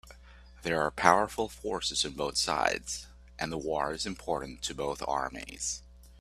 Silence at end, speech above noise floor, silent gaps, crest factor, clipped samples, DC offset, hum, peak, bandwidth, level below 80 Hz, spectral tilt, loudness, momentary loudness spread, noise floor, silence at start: 0 s; 21 dB; none; 30 dB; under 0.1%; under 0.1%; none; -2 dBFS; 15 kHz; -52 dBFS; -2.5 dB/octave; -31 LUFS; 13 LU; -53 dBFS; 0.05 s